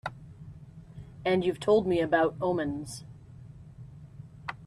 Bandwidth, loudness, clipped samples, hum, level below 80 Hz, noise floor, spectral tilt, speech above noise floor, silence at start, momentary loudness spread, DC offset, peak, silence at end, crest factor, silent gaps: 13.5 kHz; -28 LUFS; under 0.1%; none; -58 dBFS; -48 dBFS; -6 dB/octave; 21 dB; 0.05 s; 24 LU; under 0.1%; -12 dBFS; 0 s; 18 dB; none